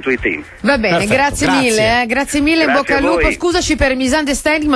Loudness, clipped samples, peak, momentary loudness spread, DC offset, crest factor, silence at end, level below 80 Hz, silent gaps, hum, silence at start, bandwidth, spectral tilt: -14 LUFS; under 0.1%; -2 dBFS; 4 LU; under 0.1%; 12 dB; 0 s; -30 dBFS; none; none; 0 s; 11 kHz; -4 dB/octave